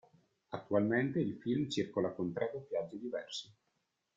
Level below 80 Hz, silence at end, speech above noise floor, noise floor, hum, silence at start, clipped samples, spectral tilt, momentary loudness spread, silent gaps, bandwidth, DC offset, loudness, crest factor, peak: -74 dBFS; 0.65 s; 47 dB; -82 dBFS; none; 0.5 s; under 0.1%; -6 dB/octave; 12 LU; none; 9 kHz; under 0.1%; -36 LUFS; 20 dB; -18 dBFS